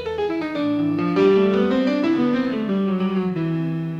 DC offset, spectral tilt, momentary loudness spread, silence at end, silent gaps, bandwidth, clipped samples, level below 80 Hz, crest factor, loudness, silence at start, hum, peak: under 0.1%; -8.5 dB/octave; 7 LU; 0 s; none; 7.4 kHz; under 0.1%; -56 dBFS; 14 dB; -20 LUFS; 0 s; none; -6 dBFS